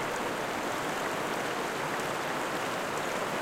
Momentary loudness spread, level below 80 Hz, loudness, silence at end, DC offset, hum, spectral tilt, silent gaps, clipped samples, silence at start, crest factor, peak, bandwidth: 0 LU; -62 dBFS; -32 LUFS; 0 s; under 0.1%; none; -3 dB/octave; none; under 0.1%; 0 s; 12 dB; -20 dBFS; 16.5 kHz